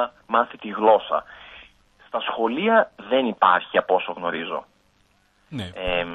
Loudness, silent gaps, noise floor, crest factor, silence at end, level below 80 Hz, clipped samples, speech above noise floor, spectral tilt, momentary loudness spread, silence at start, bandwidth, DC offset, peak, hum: -22 LUFS; none; -62 dBFS; 20 dB; 0 s; -52 dBFS; under 0.1%; 40 dB; -6.5 dB/octave; 15 LU; 0 s; 9 kHz; under 0.1%; -2 dBFS; none